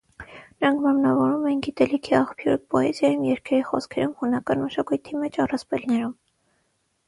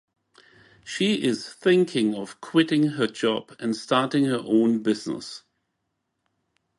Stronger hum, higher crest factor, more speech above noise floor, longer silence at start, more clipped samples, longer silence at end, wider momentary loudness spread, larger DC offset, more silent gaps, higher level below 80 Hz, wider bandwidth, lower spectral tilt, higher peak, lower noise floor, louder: neither; about the same, 18 dB vs 20 dB; second, 48 dB vs 55 dB; second, 0.2 s vs 0.85 s; neither; second, 0.95 s vs 1.4 s; second, 7 LU vs 12 LU; neither; neither; first, -58 dBFS vs -70 dBFS; about the same, 11.5 kHz vs 11.5 kHz; about the same, -6.5 dB/octave vs -5.5 dB/octave; about the same, -6 dBFS vs -4 dBFS; second, -70 dBFS vs -78 dBFS; about the same, -23 LUFS vs -24 LUFS